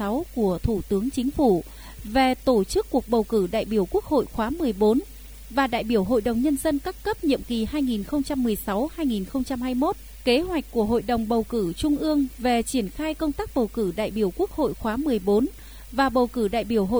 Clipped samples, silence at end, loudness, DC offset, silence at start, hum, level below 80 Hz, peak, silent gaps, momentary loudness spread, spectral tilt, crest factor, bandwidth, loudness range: under 0.1%; 0 s; -24 LUFS; 0.1%; 0 s; none; -40 dBFS; -8 dBFS; none; 5 LU; -5.5 dB/octave; 16 dB; over 20 kHz; 2 LU